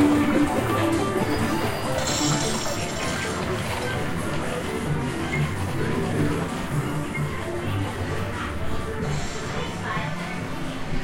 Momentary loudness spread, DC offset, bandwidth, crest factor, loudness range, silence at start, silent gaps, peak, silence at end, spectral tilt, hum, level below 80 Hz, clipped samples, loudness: 7 LU; under 0.1%; 16 kHz; 18 dB; 5 LU; 0 s; none; -8 dBFS; 0 s; -5 dB/octave; none; -38 dBFS; under 0.1%; -26 LUFS